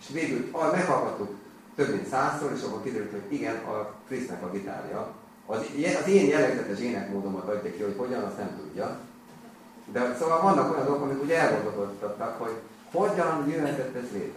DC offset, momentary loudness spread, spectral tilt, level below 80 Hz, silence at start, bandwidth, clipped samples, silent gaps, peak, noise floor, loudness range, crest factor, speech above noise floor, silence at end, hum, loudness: under 0.1%; 13 LU; -6 dB/octave; -68 dBFS; 0 s; 15.5 kHz; under 0.1%; none; -8 dBFS; -49 dBFS; 6 LU; 22 dB; 21 dB; 0 s; none; -28 LUFS